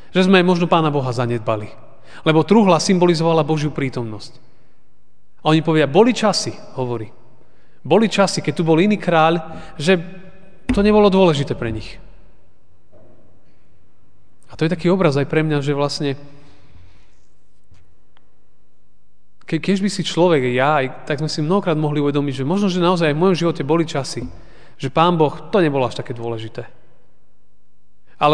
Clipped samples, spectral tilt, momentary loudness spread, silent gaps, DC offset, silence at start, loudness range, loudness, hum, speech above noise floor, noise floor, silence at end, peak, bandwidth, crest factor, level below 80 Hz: under 0.1%; -6 dB/octave; 14 LU; none; 2%; 0.15 s; 7 LU; -17 LUFS; none; 46 dB; -63 dBFS; 0 s; 0 dBFS; 10 kHz; 18 dB; -46 dBFS